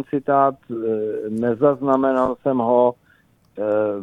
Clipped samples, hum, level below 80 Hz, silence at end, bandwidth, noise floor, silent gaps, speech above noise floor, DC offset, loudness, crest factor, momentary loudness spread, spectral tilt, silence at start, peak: under 0.1%; none; -58 dBFS; 0 s; 9.6 kHz; -57 dBFS; none; 38 dB; under 0.1%; -20 LUFS; 16 dB; 7 LU; -9 dB/octave; 0 s; -4 dBFS